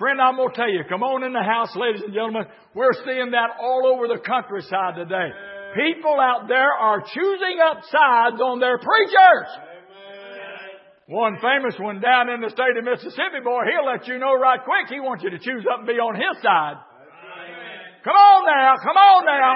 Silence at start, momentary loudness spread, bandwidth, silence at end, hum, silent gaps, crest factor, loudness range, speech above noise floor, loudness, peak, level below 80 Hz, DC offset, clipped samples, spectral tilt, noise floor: 0 s; 17 LU; 5.8 kHz; 0 s; none; none; 18 dB; 5 LU; 24 dB; -19 LUFS; -2 dBFS; -80 dBFS; under 0.1%; under 0.1%; -8.5 dB/octave; -42 dBFS